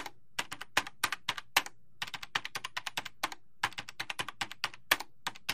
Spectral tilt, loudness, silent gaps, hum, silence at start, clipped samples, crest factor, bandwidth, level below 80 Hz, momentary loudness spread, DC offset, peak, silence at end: -0.5 dB/octave; -36 LUFS; none; none; 0 s; under 0.1%; 30 dB; 15.5 kHz; -70 dBFS; 9 LU; 0.4%; -8 dBFS; 0 s